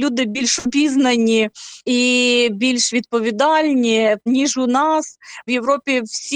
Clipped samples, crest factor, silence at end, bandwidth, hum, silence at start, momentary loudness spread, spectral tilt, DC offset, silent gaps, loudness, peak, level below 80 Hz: under 0.1%; 12 dB; 0 s; 10 kHz; none; 0 s; 6 LU; -2.5 dB/octave; under 0.1%; none; -17 LUFS; -4 dBFS; -60 dBFS